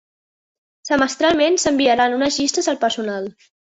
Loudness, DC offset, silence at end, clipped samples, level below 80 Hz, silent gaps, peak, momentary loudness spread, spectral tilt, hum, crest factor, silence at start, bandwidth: -18 LUFS; under 0.1%; 0.45 s; under 0.1%; -54 dBFS; none; -4 dBFS; 11 LU; -2.5 dB/octave; none; 16 dB; 0.85 s; 8.2 kHz